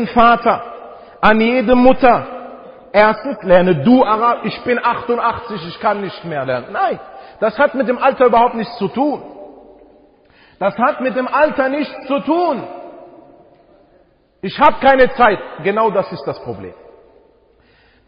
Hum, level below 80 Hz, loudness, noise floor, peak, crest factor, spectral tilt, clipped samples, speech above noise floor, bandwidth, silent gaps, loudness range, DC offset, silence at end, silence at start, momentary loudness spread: none; -44 dBFS; -15 LUFS; -53 dBFS; 0 dBFS; 16 dB; -9 dB/octave; under 0.1%; 39 dB; 5.4 kHz; none; 6 LU; under 0.1%; 1.25 s; 0 s; 16 LU